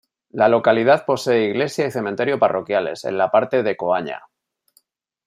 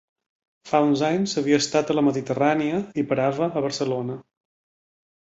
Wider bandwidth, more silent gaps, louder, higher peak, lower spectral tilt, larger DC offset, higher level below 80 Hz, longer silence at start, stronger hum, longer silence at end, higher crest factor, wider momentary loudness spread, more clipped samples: first, 15 kHz vs 8.2 kHz; neither; first, -19 LUFS vs -23 LUFS; first, -2 dBFS vs -6 dBFS; about the same, -5.5 dB/octave vs -5 dB/octave; neither; about the same, -68 dBFS vs -64 dBFS; second, 0.35 s vs 0.65 s; neither; about the same, 1.1 s vs 1.1 s; about the same, 16 dB vs 18 dB; about the same, 8 LU vs 6 LU; neither